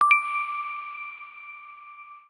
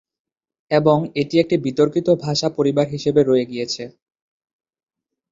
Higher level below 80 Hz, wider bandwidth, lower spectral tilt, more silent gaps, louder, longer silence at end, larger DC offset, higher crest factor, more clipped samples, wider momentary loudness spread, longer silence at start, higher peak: second, -82 dBFS vs -58 dBFS; first, 10 kHz vs 7.8 kHz; second, 1.5 dB/octave vs -6 dB/octave; neither; second, -26 LUFS vs -19 LUFS; second, 0.1 s vs 1.4 s; neither; about the same, 22 dB vs 18 dB; neither; first, 23 LU vs 9 LU; second, 0 s vs 0.7 s; second, -6 dBFS vs -2 dBFS